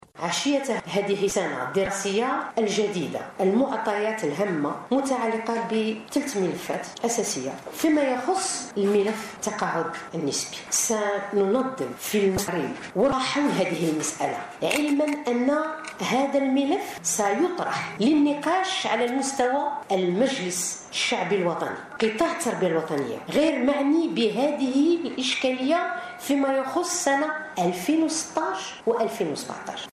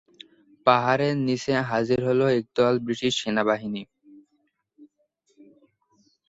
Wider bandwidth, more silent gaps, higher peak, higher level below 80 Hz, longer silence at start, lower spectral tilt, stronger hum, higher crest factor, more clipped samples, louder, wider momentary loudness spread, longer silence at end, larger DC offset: first, 14.5 kHz vs 8 kHz; neither; second, -10 dBFS vs -2 dBFS; about the same, -62 dBFS vs -62 dBFS; second, 0.15 s vs 0.65 s; second, -3.5 dB/octave vs -5.5 dB/octave; neither; second, 16 dB vs 22 dB; neither; about the same, -25 LUFS vs -23 LUFS; about the same, 6 LU vs 5 LU; second, 0 s vs 1.45 s; neither